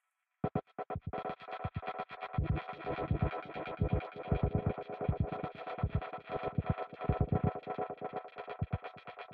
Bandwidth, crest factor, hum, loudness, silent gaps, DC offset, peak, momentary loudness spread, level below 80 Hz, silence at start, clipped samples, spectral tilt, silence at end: 4.9 kHz; 18 dB; none; -38 LUFS; none; under 0.1%; -18 dBFS; 8 LU; -46 dBFS; 0.45 s; under 0.1%; -10.5 dB/octave; 0 s